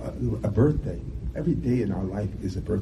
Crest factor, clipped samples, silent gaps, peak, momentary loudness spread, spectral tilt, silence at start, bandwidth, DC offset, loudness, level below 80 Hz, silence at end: 18 dB; under 0.1%; none; -8 dBFS; 10 LU; -9.5 dB/octave; 0 s; 11.5 kHz; under 0.1%; -27 LUFS; -36 dBFS; 0 s